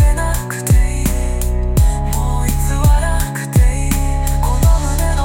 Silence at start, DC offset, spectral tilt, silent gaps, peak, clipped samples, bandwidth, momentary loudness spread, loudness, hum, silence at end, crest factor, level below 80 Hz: 0 s; under 0.1%; -5.5 dB/octave; none; 0 dBFS; under 0.1%; 17 kHz; 5 LU; -16 LUFS; none; 0 s; 12 dB; -14 dBFS